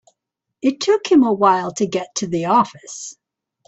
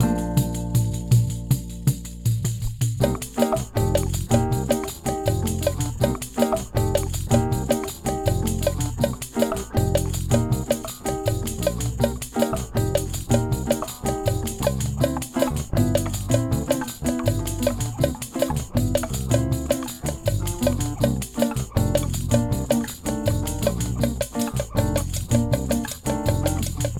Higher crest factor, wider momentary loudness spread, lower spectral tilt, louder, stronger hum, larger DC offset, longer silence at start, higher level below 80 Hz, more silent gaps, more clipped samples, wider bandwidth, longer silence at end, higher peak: about the same, 18 dB vs 20 dB; first, 17 LU vs 4 LU; second, -4.5 dB/octave vs -6 dB/octave; first, -18 LUFS vs -24 LUFS; neither; neither; first, 0.65 s vs 0 s; second, -62 dBFS vs -34 dBFS; neither; neither; second, 8.4 kHz vs 19 kHz; first, 0.55 s vs 0 s; about the same, -2 dBFS vs -2 dBFS